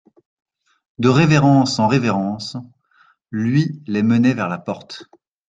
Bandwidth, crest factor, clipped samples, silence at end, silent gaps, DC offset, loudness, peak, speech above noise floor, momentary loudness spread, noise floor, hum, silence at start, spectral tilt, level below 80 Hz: 9.2 kHz; 16 dB; under 0.1%; 0.45 s; none; under 0.1%; -17 LUFS; -2 dBFS; 40 dB; 17 LU; -57 dBFS; none; 1 s; -6.5 dB/octave; -54 dBFS